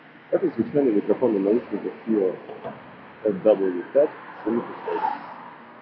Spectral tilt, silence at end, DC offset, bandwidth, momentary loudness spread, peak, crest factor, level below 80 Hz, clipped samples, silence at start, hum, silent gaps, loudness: -11 dB/octave; 0 s; under 0.1%; 5.4 kHz; 17 LU; -6 dBFS; 18 dB; -70 dBFS; under 0.1%; 0.3 s; none; none; -24 LUFS